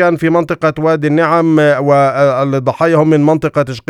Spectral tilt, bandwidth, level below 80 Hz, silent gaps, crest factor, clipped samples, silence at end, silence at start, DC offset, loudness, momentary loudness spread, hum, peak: -7.5 dB/octave; 12 kHz; -50 dBFS; none; 12 dB; under 0.1%; 0.1 s; 0 s; under 0.1%; -11 LUFS; 4 LU; none; 0 dBFS